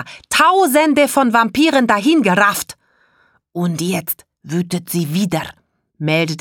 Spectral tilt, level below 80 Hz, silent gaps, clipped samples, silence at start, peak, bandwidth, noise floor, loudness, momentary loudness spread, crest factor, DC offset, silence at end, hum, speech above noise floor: -4.5 dB/octave; -56 dBFS; none; under 0.1%; 0 s; 0 dBFS; 19.5 kHz; -58 dBFS; -15 LUFS; 12 LU; 16 dB; under 0.1%; 0 s; none; 42 dB